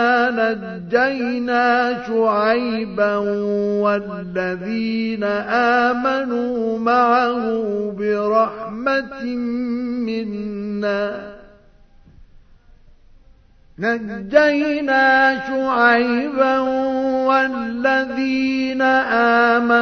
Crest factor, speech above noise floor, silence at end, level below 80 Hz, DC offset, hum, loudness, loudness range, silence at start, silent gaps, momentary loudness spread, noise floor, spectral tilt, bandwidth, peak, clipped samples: 18 dB; 31 dB; 0 s; -52 dBFS; under 0.1%; none; -18 LUFS; 9 LU; 0 s; none; 9 LU; -49 dBFS; -6 dB/octave; 6.6 kHz; 0 dBFS; under 0.1%